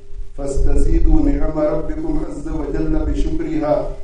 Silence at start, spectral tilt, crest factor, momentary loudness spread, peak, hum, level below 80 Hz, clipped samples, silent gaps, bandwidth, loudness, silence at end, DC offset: 0 s; -8 dB/octave; 14 dB; 8 LU; 0 dBFS; none; -18 dBFS; under 0.1%; none; 9.2 kHz; -21 LUFS; 0 s; under 0.1%